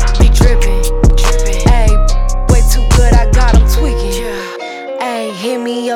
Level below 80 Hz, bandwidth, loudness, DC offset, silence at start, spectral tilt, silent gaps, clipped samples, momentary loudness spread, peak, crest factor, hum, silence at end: -10 dBFS; 15 kHz; -13 LUFS; under 0.1%; 0 s; -5.5 dB/octave; none; under 0.1%; 10 LU; 0 dBFS; 8 dB; none; 0 s